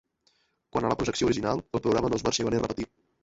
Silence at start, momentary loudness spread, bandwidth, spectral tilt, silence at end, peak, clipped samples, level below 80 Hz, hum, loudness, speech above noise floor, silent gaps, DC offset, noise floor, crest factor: 0.75 s; 7 LU; 8 kHz; -5 dB/octave; 0.4 s; -10 dBFS; under 0.1%; -50 dBFS; none; -28 LUFS; 43 dB; none; under 0.1%; -70 dBFS; 18 dB